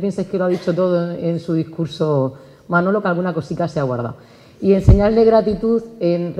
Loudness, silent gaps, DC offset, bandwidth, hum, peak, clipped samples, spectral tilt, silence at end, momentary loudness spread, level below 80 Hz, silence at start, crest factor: -18 LUFS; none; under 0.1%; 10.5 kHz; none; 0 dBFS; under 0.1%; -8.5 dB/octave; 0 s; 10 LU; -30 dBFS; 0 s; 16 dB